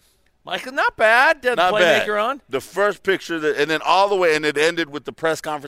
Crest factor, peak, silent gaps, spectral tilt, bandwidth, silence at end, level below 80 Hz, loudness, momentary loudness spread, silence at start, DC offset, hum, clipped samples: 18 dB; -2 dBFS; none; -3 dB/octave; 16 kHz; 0 s; -58 dBFS; -18 LUFS; 11 LU; 0.45 s; under 0.1%; none; under 0.1%